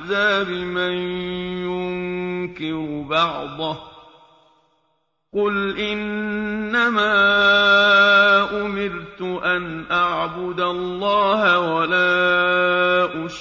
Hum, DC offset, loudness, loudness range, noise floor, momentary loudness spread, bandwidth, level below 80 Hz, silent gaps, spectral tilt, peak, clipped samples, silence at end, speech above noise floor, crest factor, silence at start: none; under 0.1%; -19 LUFS; 10 LU; -69 dBFS; 14 LU; 7.4 kHz; -52 dBFS; none; -5 dB/octave; -4 dBFS; under 0.1%; 0 s; 50 dB; 16 dB; 0 s